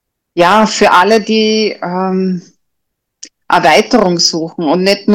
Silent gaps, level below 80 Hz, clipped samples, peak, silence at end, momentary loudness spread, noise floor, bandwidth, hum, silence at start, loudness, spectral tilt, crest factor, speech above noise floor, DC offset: none; -48 dBFS; under 0.1%; 0 dBFS; 0 s; 9 LU; -72 dBFS; 17 kHz; none; 0.35 s; -10 LUFS; -4 dB/octave; 12 dB; 61 dB; under 0.1%